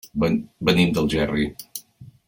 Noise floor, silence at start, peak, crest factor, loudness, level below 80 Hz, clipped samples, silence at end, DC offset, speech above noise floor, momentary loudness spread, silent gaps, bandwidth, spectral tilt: -46 dBFS; 0.05 s; -6 dBFS; 18 dB; -22 LUFS; -44 dBFS; under 0.1%; 0.2 s; under 0.1%; 25 dB; 17 LU; none; 17 kHz; -6 dB/octave